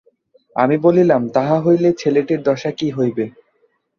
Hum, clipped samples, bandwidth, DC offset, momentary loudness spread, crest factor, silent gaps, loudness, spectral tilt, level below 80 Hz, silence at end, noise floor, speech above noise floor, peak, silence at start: none; under 0.1%; 7 kHz; under 0.1%; 8 LU; 16 dB; none; -16 LUFS; -7.5 dB/octave; -60 dBFS; 0.7 s; -62 dBFS; 47 dB; -2 dBFS; 0.55 s